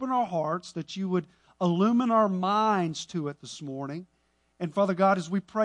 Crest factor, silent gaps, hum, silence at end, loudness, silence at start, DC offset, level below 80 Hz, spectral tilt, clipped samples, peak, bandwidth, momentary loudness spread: 16 dB; none; none; 0 s; -27 LUFS; 0 s; under 0.1%; -72 dBFS; -6.5 dB/octave; under 0.1%; -10 dBFS; 10 kHz; 13 LU